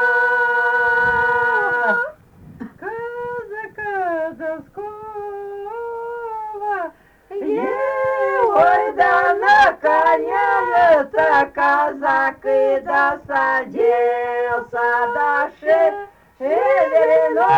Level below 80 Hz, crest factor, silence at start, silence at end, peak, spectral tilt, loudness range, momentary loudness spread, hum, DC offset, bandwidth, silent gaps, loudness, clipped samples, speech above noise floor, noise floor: -54 dBFS; 14 dB; 0 s; 0 s; -4 dBFS; -5 dB/octave; 12 LU; 15 LU; none; under 0.1%; 9.8 kHz; none; -17 LUFS; under 0.1%; 26 dB; -43 dBFS